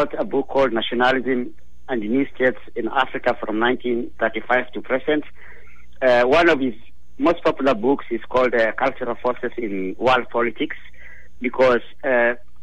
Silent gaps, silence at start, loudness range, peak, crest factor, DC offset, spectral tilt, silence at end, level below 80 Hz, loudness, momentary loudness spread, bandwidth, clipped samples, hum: none; 0 s; 3 LU; -4 dBFS; 16 dB; 3%; -6 dB/octave; 0.25 s; -50 dBFS; -21 LUFS; 9 LU; 9 kHz; under 0.1%; none